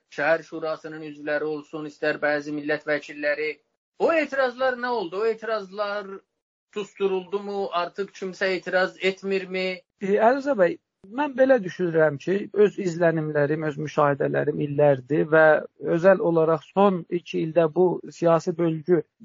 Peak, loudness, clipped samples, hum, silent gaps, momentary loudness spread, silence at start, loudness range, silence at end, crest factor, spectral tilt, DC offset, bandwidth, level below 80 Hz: -4 dBFS; -24 LUFS; under 0.1%; none; 3.77-3.92 s, 6.42-6.68 s; 11 LU; 0.1 s; 7 LU; 0.25 s; 18 dB; -5 dB/octave; under 0.1%; 7.6 kHz; -72 dBFS